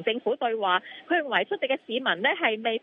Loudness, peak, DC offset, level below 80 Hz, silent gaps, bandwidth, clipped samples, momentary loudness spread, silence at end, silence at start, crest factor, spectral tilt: -26 LUFS; -8 dBFS; under 0.1%; -84 dBFS; none; 4 kHz; under 0.1%; 4 LU; 0.05 s; 0 s; 18 dB; -6.5 dB/octave